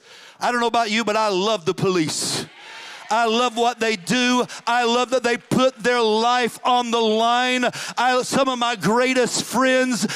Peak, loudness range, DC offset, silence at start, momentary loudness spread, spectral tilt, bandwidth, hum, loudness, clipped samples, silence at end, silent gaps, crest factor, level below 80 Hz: -8 dBFS; 2 LU; under 0.1%; 0.1 s; 5 LU; -3.5 dB/octave; 16 kHz; none; -20 LUFS; under 0.1%; 0 s; none; 14 dB; -64 dBFS